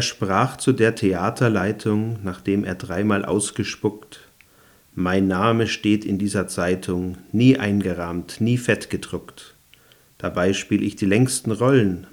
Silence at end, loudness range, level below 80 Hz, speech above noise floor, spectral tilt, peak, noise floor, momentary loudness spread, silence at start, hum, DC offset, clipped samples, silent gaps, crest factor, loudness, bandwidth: 0.1 s; 4 LU; -56 dBFS; 33 dB; -5.5 dB/octave; -4 dBFS; -54 dBFS; 9 LU; 0 s; none; under 0.1%; under 0.1%; none; 18 dB; -21 LUFS; over 20 kHz